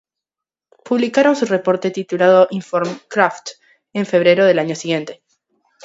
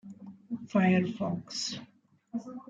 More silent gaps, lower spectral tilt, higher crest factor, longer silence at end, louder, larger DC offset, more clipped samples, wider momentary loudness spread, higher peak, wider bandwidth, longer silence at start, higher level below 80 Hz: neither; about the same, -5.5 dB/octave vs -5.5 dB/octave; about the same, 18 dB vs 20 dB; first, 0.7 s vs 0.1 s; first, -16 LUFS vs -31 LUFS; neither; neither; second, 12 LU vs 18 LU; first, 0 dBFS vs -14 dBFS; about the same, 8 kHz vs 7.8 kHz; first, 0.85 s vs 0.05 s; about the same, -68 dBFS vs -72 dBFS